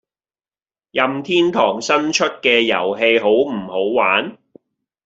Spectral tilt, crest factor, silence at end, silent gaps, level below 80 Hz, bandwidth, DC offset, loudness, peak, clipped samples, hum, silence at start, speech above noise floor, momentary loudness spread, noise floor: -3.5 dB/octave; 16 dB; 0.7 s; none; -64 dBFS; 8 kHz; under 0.1%; -16 LUFS; -2 dBFS; under 0.1%; none; 0.95 s; over 73 dB; 6 LU; under -90 dBFS